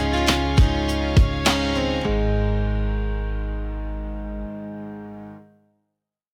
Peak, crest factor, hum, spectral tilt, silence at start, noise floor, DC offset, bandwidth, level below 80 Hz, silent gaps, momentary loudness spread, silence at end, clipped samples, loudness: -6 dBFS; 16 dB; none; -5.5 dB/octave; 0 s; -80 dBFS; under 0.1%; 16 kHz; -26 dBFS; none; 16 LU; 0.9 s; under 0.1%; -23 LUFS